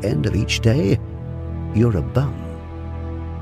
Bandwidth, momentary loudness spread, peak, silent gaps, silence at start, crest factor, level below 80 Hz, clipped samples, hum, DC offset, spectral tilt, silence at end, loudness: 13.5 kHz; 14 LU; -4 dBFS; none; 0 s; 18 dB; -32 dBFS; under 0.1%; none; under 0.1%; -6.5 dB/octave; 0 s; -21 LUFS